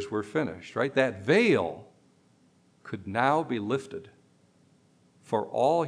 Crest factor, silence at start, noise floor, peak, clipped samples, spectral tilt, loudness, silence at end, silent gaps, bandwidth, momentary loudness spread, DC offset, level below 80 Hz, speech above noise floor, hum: 18 dB; 0 s; -63 dBFS; -10 dBFS; under 0.1%; -6 dB/octave; -27 LUFS; 0 s; none; 10.5 kHz; 17 LU; under 0.1%; -72 dBFS; 36 dB; none